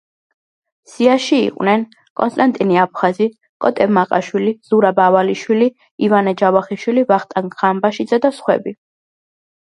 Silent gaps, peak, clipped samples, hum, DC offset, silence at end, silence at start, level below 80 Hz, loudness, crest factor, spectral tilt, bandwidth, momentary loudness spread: 2.10-2.16 s, 3.49-3.60 s, 5.91-5.98 s; 0 dBFS; under 0.1%; none; under 0.1%; 1 s; 1 s; -64 dBFS; -16 LUFS; 16 dB; -6 dB/octave; 11 kHz; 7 LU